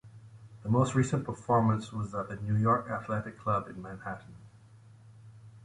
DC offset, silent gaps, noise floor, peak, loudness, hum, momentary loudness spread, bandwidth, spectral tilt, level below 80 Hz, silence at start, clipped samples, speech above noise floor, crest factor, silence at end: under 0.1%; none; -55 dBFS; -14 dBFS; -31 LUFS; none; 15 LU; 11 kHz; -7.5 dB/octave; -58 dBFS; 0.05 s; under 0.1%; 25 dB; 18 dB; 0 s